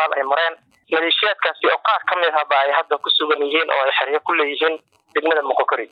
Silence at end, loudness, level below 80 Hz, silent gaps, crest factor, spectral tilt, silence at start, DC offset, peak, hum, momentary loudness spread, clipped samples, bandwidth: 0.05 s; -18 LUFS; -84 dBFS; none; 14 dB; -3 dB/octave; 0 s; under 0.1%; -6 dBFS; none; 5 LU; under 0.1%; 5.2 kHz